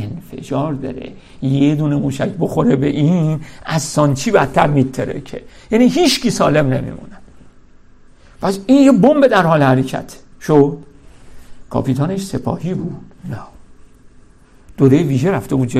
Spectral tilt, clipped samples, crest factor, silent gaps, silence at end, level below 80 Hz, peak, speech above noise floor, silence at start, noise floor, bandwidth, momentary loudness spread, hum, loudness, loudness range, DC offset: -6.5 dB/octave; under 0.1%; 16 dB; none; 0 s; -42 dBFS; 0 dBFS; 30 dB; 0 s; -44 dBFS; 14.5 kHz; 18 LU; none; -15 LUFS; 8 LU; under 0.1%